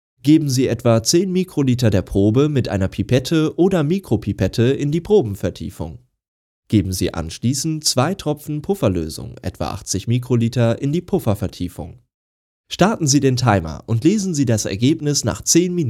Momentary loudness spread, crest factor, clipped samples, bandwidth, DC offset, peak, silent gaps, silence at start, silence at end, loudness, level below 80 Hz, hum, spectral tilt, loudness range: 11 LU; 18 dB; under 0.1%; 16 kHz; under 0.1%; 0 dBFS; 6.28-6.63 s, 12.14-12.64 s; 0.25 s; 0 s; -18 LUFS; -44 dBFS; none; -5.5 dB/octave; 4 LU